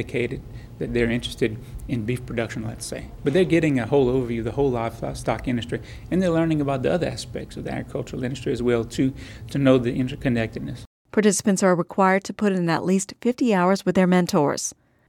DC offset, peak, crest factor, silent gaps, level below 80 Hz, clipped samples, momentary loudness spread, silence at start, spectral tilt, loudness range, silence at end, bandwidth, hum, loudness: under 0.1%; -4 dBFS; 18 dB; 10.87-11.05 s; -44 dBFS; under 0.1%; 12 LU; 0 s; -5.5 dB/octave; 4 LU; 0.35 s; 16.5 kHz; none; -23 LUFS